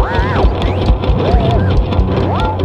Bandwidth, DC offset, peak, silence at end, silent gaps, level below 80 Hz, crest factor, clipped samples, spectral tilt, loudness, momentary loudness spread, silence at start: 6.8 kHz; under 0.1%; 0 dBFS; 0 s; none; -16 dBFS; 12 dB; under 0.1%; -8 dB/octave; -14 LUFS; 2 LU; 0 s